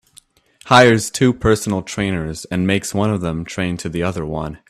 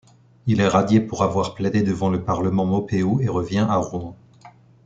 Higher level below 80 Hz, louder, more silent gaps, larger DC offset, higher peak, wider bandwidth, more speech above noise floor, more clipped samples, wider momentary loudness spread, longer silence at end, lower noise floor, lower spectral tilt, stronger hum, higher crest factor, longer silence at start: first, -40 dBFS vs -52 dBFS; first, -17 LUFS vs -21 LUFS; neither; neither; about the same, 0 dBFS vs -2 dBFS; first, 14.5 kHz vs 7.8 kHz; first, 33 dB vs 28 dB; neither; first, 13 LU vs 6 LU; second, 0.15 s vs 0.35 s; about the same, -51 dBFS vs -48 dBFS; second, -5 dB/octave vs -7 dB/octave; neither; about the same, 18 dB vs 18 dB; first, 0.65 s vs 0.45 s